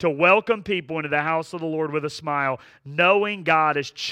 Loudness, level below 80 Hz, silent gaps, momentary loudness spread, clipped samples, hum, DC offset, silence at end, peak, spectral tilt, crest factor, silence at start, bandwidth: -22 LUFS; -64 dBFS; none; 10 LU; under 0.1%; none; under 0.1%; 0 s; -4 dBFS; -5 dB/octave; 18 dB; 0 s; 11.5 kHz